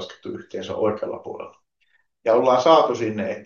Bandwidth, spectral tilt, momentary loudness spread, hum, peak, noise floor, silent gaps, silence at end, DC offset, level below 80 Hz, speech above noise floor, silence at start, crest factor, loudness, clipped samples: 7.2 kHz; -5.5 dB/octave; 20 LU; none; -2 dBFS; -67 dBFS; none; 0 s; under 0.1%; -72 dBFS; 47 dB; 0 s; 20 dB; -20 LUFS; under 0.1%